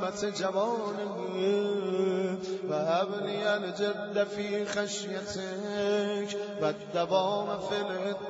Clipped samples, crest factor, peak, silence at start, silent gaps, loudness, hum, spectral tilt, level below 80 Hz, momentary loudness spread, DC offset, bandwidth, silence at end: under 0.1%; 18 dB; -14 dBFS; 0 s; none; -31 LUFS; none; -4.5 dB/octave; -72 dBFS; 6 LU; under 0.1%; 8 kHz; 0 s